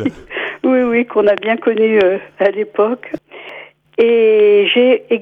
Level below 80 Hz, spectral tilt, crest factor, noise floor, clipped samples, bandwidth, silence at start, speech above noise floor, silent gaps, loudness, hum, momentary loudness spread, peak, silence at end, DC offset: -56 dBFS; -7 dB/octave; 12 dB; -36 dBFS; under 0.1%; 4.7 kHz; 0 s; 23 dB; none; -13 LUFS; none; 17 LU; -2 dBFS; 0 s; under 0.1%